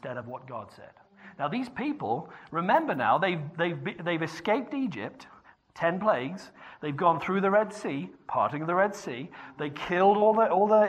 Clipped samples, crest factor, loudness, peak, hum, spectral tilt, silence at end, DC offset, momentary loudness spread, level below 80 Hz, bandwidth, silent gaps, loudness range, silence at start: under 0.1%; 18 dB; -28 LUFS; -10 dBFS; none; -6.5 dB/octave; 0 s; under 0.1%; 16 LU; -70 dBFS; 9.8 kHz; none; 4 LU; 0.05 s